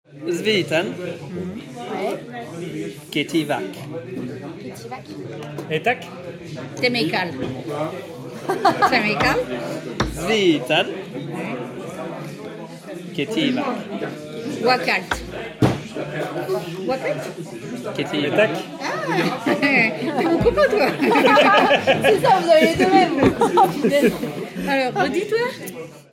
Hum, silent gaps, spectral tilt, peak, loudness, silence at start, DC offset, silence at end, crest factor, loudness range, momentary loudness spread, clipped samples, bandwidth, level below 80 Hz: none; none; -5 dB/octave; -2 dBFS; -20 LUFS; 0.1 s; under 0.1%; 0.1 s; 18 dB; 11 LU; 17 LU; under 0.1%; 16.5 kHz; -48 dBFS